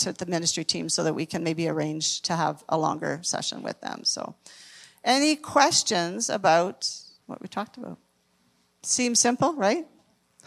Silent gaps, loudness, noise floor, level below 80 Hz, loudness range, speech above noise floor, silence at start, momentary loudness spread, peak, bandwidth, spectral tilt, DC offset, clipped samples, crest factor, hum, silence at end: none; -25 LUFS; -67 dBFS; -72 dBFS; 4 LU; 41 dB; 0 s; 16 LU; -4 dBFS; 15 kHz; -2.5 dB/octave; under 0.1%; under 0.1%; 24 dB; none; 0.6 s